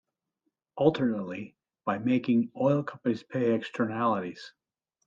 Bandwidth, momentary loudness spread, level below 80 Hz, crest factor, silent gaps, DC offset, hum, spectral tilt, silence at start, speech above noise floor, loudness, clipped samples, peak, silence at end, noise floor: 7.4 kHz; 15 LU; -74 dBFS; 22 dB; none; under 0.1%; none; -8 dB/octave; 0.75 s; 53 dB; -29 LUFS; under 0.1%; -8 dBFS; 0.55 s; -81 dBFS